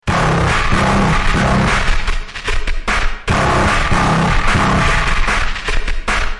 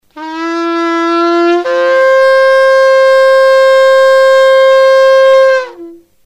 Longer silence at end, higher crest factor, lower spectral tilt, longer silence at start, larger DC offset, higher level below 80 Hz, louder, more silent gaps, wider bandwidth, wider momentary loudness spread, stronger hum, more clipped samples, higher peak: second, 0 s vs 0.3 s; about the same, 12 dB vs 8 dB; first, -5 dB/octave vs -1.5 dB/octave; about the same, 0.05 s vs 0.15 s; neither; first, -18 dBFS vs -60 dBFS; second, -15 LUFS vs -7 LUFS; neither; first, 11.5 kHz vs 10 kHz; about the same, 8 LU vs 8 LU; neither; second, under 0.1% vs 1%; about the same, -2 dBFS vs 0 dBFS